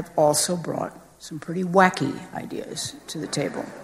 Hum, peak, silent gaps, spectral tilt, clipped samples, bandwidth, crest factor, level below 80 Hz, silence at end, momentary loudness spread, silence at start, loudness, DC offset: none; -2 dBFS; none; -4 dB/octave; under 0.1%; 15 kHz; 22 dB; -62 dBFS; 0 s; 15 LU; 0 s; -24 LUFS; under 0.1%